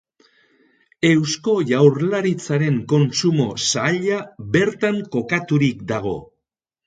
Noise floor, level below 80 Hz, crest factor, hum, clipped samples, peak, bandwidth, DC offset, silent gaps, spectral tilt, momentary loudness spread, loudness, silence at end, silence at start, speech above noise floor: -81 dBFS; -56 dBFS; 18 dB; none; under 0.1%; -2 dBFS; 9.4 kHz; under 0.1%; none; -5.5 dB/octave; 9 LU; -19 LUFS; 0.6 s; 1 s; 62 dB